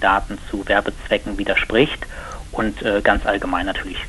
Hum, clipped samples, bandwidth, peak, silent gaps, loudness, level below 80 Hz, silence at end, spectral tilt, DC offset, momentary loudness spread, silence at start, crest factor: none; under 0.1%; 11.5 kHz; -2 dBFS; none; -20 LUFS; -32 dBFS; 0 s; -5 dB/octave; under 0.1%; 12 LU; 0 s; 18 dB